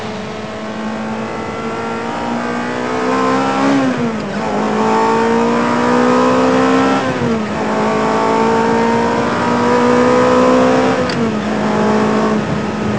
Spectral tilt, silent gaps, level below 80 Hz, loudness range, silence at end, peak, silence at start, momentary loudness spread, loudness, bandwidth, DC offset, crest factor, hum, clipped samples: -5.5 dB/octave; none; -42 dBFS; 4 LU; 0 s; 0 dBFS; 0 s; 10 LU; -14 LUFS; 8 kHz; 1%; 14 dB; none; under 0.1%